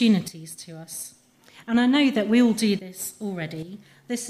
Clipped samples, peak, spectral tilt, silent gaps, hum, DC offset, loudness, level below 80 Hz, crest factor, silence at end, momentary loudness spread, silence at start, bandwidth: under 0.1%; -8 dBFS; -4.5 dB/octave; none; none; under 0.1%; -23 LUFS; -70 dBFS; 16 dB; 0 s; 19 LU; 0 s; 15 kHz